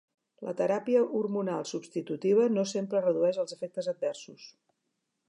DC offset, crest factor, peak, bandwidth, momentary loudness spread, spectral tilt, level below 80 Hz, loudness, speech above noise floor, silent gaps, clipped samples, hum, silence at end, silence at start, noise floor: under 0.1%; 16 dB; -14 dBFS; 11 kHz; 11 LU; -6 dB/octave; -86 dBFS; -30 LUFS; 52 dB; none; under 0.1%; none; 0.8 s; 0.4 s; -81 dBFS